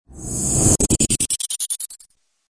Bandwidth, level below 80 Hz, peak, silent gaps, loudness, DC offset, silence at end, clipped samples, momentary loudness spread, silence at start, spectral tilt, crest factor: 11 kHz; -34 dBFS; -2 dBFS; none; -18 LUFS; under 0.1%; 0.55 s; under 0.1%; 11 LU; 0.1 s; -3.5 dB/octave; 20 dB